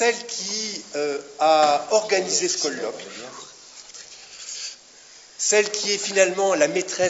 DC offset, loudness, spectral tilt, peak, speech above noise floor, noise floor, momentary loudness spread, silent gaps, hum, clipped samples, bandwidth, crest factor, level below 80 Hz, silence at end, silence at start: under 0.1%; -22 LUFS; -1.5 dB/octave; -4 dBFS; 26 dB; -48 dBFS; 21 LU; none; none; under 0.1%; 8 kHz; 20 dB; -74 dBFS; 0 s; 0 s